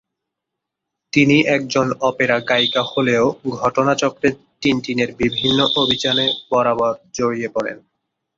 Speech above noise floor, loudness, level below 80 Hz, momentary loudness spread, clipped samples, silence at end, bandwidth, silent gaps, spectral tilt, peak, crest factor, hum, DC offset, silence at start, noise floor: 64 dB; -17 LUFS; -52 dBFS; 7 LU; under 0.1%; 0.6 s; 7.6 kHz; none; -4.5 dB/octave; -2 dBFS; 16 dB; none; under 0.1%; 1.15 s; -81 dBFS